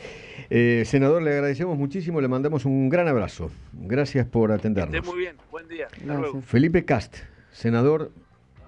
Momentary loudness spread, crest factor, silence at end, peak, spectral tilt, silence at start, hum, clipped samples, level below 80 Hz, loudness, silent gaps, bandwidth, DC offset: 16 LU; 16 dB; 0.05 s; -8 dBFS; -8 dB/octave; 0 s; none; under 0.1%; -46 dBFS; -23 LUFS; none; 9.6 kHz; under 0.1%